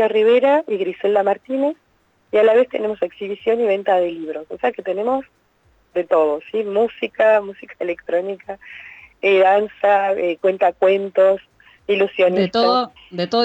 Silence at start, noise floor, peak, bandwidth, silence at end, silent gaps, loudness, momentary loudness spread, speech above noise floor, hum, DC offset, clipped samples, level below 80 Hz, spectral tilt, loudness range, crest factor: 0 s; -59 dBFS; -4 dBFS; 8 kHz; 0 s; none; -18 LUFS; 13 LU; 41 dB; none; under 0.1%; under 0.1%; -62 dBFS; -6.5 dB/octave; 4 LU; 14 dB